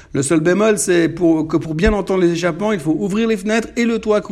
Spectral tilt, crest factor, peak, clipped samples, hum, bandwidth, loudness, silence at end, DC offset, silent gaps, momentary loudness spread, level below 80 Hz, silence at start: -5.5 dB/octave; 16 dB; 0 dBFS; under 0.1%; none; 13.5 kHz; -16 LUFS; 0 s; under 0.1%; none; 4 LU; -34 dBFS; 0.15 s